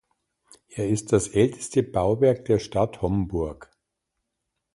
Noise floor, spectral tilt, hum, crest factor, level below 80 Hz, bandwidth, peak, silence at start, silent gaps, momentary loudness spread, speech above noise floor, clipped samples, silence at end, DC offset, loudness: -81 dBFS; -6.5 dB/octave; none; 20 dB; -46 dBFS; 11.5 kHz; -6 dBFS; 0.75 s; none; 9 LU; 58 dB; under 0.1%; 1.1 s; under 0.1%; -24 LUFS